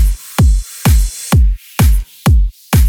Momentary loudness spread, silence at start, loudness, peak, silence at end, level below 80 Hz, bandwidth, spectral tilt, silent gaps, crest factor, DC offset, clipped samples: 2 LU; 0 s; -14 LUFS; 0 dBFS; 0 s; -12 dBFS; 19 kHz; -5.5 dB/octave; none; 10 dB; under 0.1%; under 0.1%